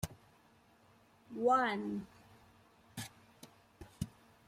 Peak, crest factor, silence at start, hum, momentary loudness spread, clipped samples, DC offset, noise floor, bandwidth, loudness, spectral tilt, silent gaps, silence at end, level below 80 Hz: -20 dBFS; 22 dB; 0.05 s; none; 28 LU; under 0.1%; under 0.1%; -67 dBFS; 16 kHz; -37 LUFS; -5 dB/octave; none; 0.4 s; -64 dBFS